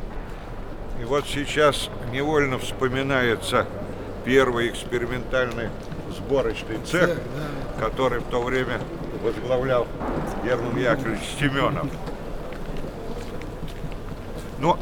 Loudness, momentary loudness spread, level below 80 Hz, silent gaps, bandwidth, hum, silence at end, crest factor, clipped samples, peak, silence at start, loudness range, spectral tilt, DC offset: -25 LUFS; 13 LU; -36 dBFS; none; 19.5 kHz; none; 0 s; 22 dB; under 0.1%; -4 dBFS; 0 s; 4 LU; -5.5 dB/octave; under 0.1%